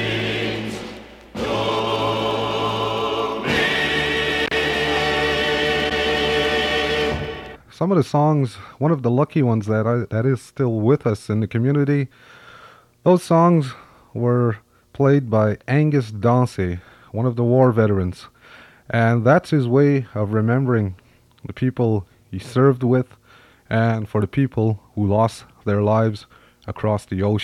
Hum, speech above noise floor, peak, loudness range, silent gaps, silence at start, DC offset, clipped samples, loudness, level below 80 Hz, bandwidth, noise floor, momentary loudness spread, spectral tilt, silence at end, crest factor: none; 32 dB; -2 dBFS; 3 LU; none; 0 s; under 0.1%; under 0.1%; -20 LUFS; -48 dBFS; 13.5 kHz; -51 dBFS; 12 LU; -6.5 dB/octave; 0 s; 18 dB